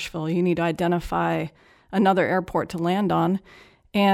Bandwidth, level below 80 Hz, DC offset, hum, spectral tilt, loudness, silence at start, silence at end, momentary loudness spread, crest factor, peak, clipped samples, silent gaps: 15 kHz; -48 dBFS; under 0.1%; none; -7 dB/octave; -23 LUFS; 0 s; 0 s; 8 LU; 16 dB; -8 dBFS; under 0.1%; none